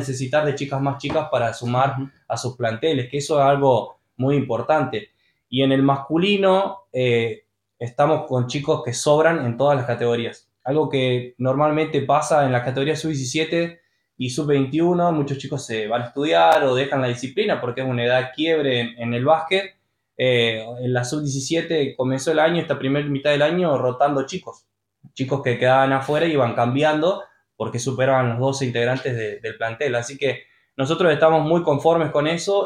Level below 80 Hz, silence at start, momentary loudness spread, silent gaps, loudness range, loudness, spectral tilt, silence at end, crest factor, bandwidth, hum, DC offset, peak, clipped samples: -60 dBFS; 0 s; 10 LU; none; 2 LU; -20 LUFS; -5.5 dB/octave; 0 s; 18 dB; 12.5 kHz; none; under 0.1%; -4 dBFS; under 0.1%